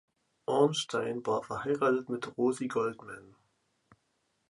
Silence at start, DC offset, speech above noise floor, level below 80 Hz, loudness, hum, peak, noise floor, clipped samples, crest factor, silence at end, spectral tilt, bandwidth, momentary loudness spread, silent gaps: 0.5 s; under 0.1%; 46 dB; -72 dBFS; -31 LUFS; none; -12 dBFS; -77 dBFS; under 0.1%; 22 dB; 1.25 s; -5 dB/octave; 11.5 kHz; 15 LU; none